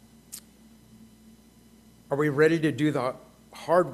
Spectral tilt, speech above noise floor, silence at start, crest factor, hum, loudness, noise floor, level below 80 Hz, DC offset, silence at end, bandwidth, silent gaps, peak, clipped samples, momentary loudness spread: -6.5 dB/octave; 32 dB; 0.3 s; 20 dB; none; -25 LUFS; -55 dBFS; -64 dBFS; under 0.1%; 0 s; 14.5 kHz; none; -8 dBFS; under 0.1%; 22 LU